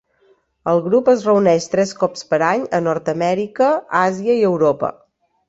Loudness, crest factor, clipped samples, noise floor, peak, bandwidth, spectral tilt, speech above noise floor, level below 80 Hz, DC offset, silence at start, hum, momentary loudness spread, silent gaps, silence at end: -17 LUFS; 16 dB; under 0.1%; -58 dBFS; -2 dBFS; 8 kHz; -6 dB/octave; 41 dB; -60 dBFS; under 0.1%; 0.65 s; none; 6 LU; none; 0.6 s